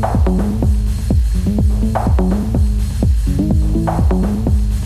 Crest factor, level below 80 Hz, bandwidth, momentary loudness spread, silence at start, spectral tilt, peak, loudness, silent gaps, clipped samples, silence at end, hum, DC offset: 12 dB; -16 dBFS; 13.5 kHz; 2 LU; 0 s; -8 dB/octave; -2 dBFS; -16 LUFS; none; under 0.1%; 0 s; none; under 0.1%